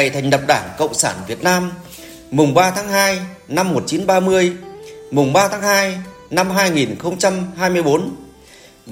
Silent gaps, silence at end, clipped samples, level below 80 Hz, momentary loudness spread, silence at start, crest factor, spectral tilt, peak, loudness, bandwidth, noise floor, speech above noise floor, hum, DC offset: none; 0 s; under 0.1%; -52 dBFS; 14 LU; 0 s; 16 dB; -4 dB/octave; 0 dBFS; -17 LUFS; 17 kHz; -44 dBFS; 28 dB; none; under 0.1%